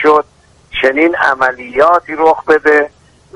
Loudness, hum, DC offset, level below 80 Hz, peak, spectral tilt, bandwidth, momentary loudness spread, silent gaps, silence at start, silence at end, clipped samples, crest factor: -11 LUFS; none; under 0.1%; -46 dBFS; 0 dBFS; -4.5 dB/octave; 10.5 kHz; 7 LU; none; 0 s; 0.5 s; 0.2%; 12 dB